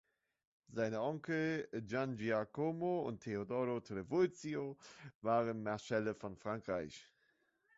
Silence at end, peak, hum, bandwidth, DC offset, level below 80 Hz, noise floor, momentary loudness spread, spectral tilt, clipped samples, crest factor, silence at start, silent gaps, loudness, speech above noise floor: 0.75 s; -22 dBFS; none; 7.6 kHz; under 0.1%; -74 dBFS; -78 dBFS; 9 LU; -6 dB/octave; under 0.1%; 18 dB; 0.7 s; 5.15-5.21 s; -40 LUFS; 39 dB